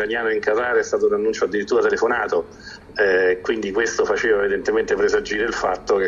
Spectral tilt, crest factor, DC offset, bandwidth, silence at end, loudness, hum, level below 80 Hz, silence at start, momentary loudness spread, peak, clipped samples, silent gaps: -3.5 dB/octave; 16 dB; under 0.1%; 7.6 kHz; 0 s; -20 LUFS; none; -48 dBFS; 0 s; 5 LU; -4 dBFS; under 0.1%; none